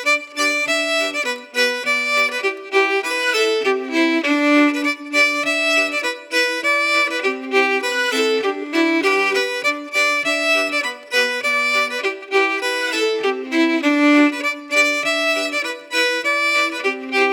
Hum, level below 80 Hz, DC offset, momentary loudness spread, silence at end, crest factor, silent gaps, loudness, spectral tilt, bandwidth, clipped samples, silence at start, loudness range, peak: none; -88 dBFS; under 0.1%; 5 LU; 0 s; 16 dB; none; -17 LUFS; -0.5 dB/octave; 20 kHz; under 0.1%; 0 s; 1 LU; -2 dBFS